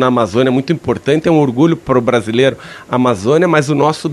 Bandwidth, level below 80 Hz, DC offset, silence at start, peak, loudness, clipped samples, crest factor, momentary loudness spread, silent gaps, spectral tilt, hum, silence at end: 12.5 kHz; -48 dBFS; under 0.1%; 0 s; 0 dBFS; -13 LUFS; under 0.1%; 12 dB; 5 LU; none; -6.5 dB/octave; none; 0 s